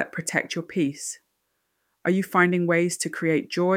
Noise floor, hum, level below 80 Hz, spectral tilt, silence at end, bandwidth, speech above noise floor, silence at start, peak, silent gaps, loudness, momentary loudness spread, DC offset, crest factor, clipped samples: -75 dBFS; none; -72 dBFS; -5 dB/octave; 0 s; 16 kHz; 51 dB; 0 s; -6 dBFS; none; -24 LUFS; 11 LU; under 0.1%; 20 dB; under 0.1%